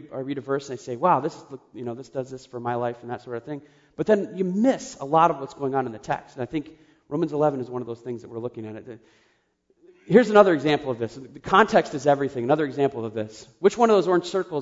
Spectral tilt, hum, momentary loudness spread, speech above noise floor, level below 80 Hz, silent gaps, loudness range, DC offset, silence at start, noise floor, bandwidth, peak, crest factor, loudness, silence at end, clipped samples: -6 dB/octave; none; 17 LU; 43 dB; -62 dBFS; none; 9 LU; under 0.1%; 0 s; -67 dBFS; 7.8 kHz; -2 dBFS; 22 dB; -23 LUFS; 0 s; under 0.1%